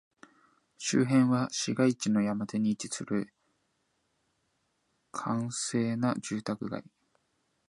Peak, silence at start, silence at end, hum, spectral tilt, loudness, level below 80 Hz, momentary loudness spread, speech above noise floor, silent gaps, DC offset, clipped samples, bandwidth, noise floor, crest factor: -12 dBFS; 0.8 s; 0.85 s; none; -5 dB/octave; -30 LUFS; -72 dBFS; 12 LU; 47 dB; none; under 0.1%; under 0.1%; 11.5 kHz; -76 dBFS; 18 dB